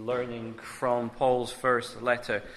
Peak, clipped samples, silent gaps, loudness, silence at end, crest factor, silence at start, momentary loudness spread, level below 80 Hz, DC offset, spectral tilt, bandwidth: -12 dBFS; under 0.1%; none; -29 LUFS; 0 s; 18 dB; 0 s; 9 LU; -58 dBFS; under 0.1%; -5 dB/octave; 13.5 kHz